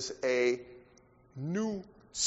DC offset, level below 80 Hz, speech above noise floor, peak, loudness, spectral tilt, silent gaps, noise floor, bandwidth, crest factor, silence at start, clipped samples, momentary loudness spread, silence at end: under 0.1%; -68 dBFS; 29 dB; -18 dBFS; -33 LUFS; -4 dB/octave; none; -62 dBFS; 8 kHz; 18 dB; 0 s; under 0.1%; 19 LU; 0 s